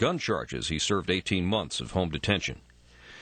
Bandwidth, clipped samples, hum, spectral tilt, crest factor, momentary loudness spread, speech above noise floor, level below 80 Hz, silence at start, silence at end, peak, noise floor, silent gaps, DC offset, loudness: 9.2 kHz; under 0.1%; none; -4.5 dB/octave; 18 dB; 4 LU; 24 dB; -48 dBFS; 0 s; 0 s; -12 dBFS; -52 dBFS; none; under 0.1%; -29 LUFS